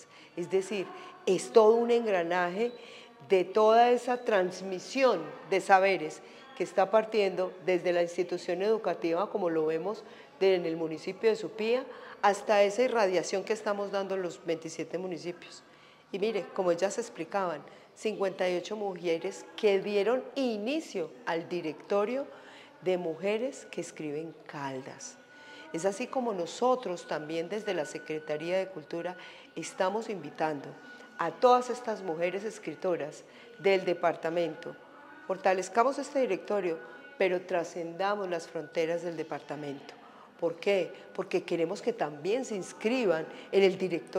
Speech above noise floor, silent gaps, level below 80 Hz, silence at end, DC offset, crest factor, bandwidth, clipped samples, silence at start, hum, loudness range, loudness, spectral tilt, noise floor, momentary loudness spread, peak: 20 dB; none; -88 dBFS; 0 s; under 0.1%; 22 dB; 13.5 kHz; under 0.1%; 0 s; none; 7 LU; -30 LUFS; -4.5 dB/octave; -50 dBFS; 15 LU; -8 dBFS